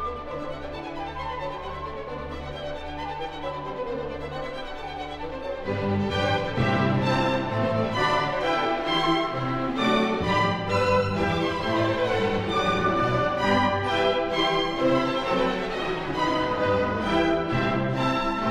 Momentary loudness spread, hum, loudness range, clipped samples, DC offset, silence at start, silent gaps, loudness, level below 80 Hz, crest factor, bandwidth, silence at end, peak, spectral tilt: 11 LU; none; 10 LU; under 0.1%; under 0.1%; 0 s; none; -25 LUFS; -44 dBFS; 16 dB; 13.5 kHz; 0 s; -10 dBFS; -6 dB/octave